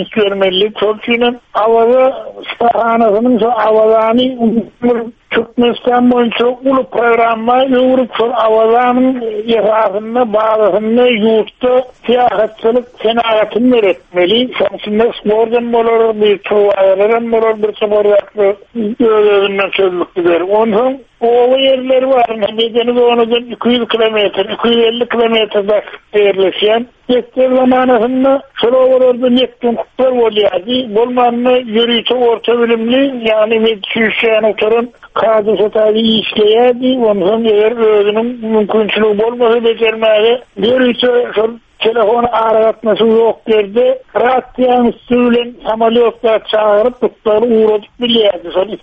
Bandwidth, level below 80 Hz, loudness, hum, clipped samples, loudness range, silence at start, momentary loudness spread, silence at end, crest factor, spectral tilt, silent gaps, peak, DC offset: 5 kHz; -48 dBFS; -11 LUFS; none; under 0.1%; 1 LU; 0 s; 5 LU; 0.05 s; 10 dB; -7 dB/octave; none; 0 dBFS; under 0.1%